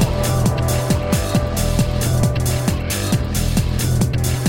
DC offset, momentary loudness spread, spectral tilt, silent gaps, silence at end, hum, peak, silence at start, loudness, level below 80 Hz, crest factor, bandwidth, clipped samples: under 0.1%; 2 LU; -5.5 dB/octave; none; 0 s; none; -4 dBFS; 0 s; -19 LUFS; -26 dBFS; 12 dB; 17 kHz; under 0.1%